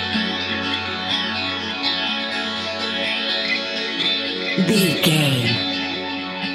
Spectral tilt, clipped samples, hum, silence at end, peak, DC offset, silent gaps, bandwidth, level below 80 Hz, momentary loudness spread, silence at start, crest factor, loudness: -4 dB/octave; under 0.1%; none; 0 s; -4 dBFS; under 0.1%; none; 16 kHz; -60 dBFS; 7 LU; 0 s; 18 dB; -20 LUFS